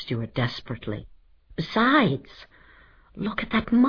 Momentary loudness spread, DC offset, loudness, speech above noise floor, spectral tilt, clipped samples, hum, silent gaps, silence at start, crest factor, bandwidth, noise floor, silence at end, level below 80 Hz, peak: 16 LU; under 0.1%; -25 LUFS; 29 dB; -7.5 dB/octave; under 0.1%; none; none; 0 s; 18 dB; 5.4 kHz; -54 dBFS; 0 s; -50 dBFS; -8 dBFS